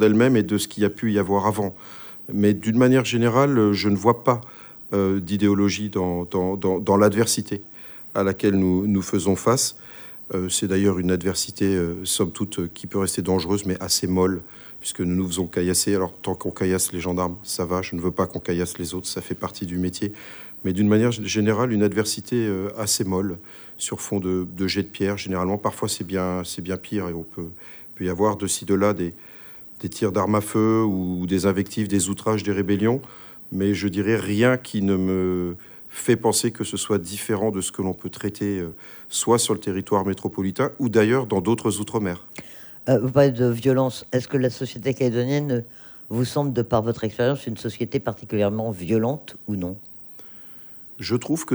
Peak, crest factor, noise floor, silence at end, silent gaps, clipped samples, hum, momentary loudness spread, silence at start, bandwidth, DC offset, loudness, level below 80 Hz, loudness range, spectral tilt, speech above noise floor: -4 dBFS; 20 dB; -42 dBFS; 0 s; none; under 0.1%; none; 13 LU; 0 s; over 20 kHz; under 0.1%; -23 LUFS; -54 dBFS; 5 LU; -5 dB/octave; 19 dB